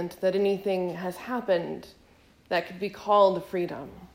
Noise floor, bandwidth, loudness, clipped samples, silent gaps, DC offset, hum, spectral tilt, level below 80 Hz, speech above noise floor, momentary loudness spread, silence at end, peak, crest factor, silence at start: -58 dBFS; 16 kHz; -27 LUFS; under 0.1%; none; under 0.1%; none; -6 dB/octave; -64 dBFS; 31 dB; 14 LU; 0.1 s; -10 dBFS; 18 dB; 0 s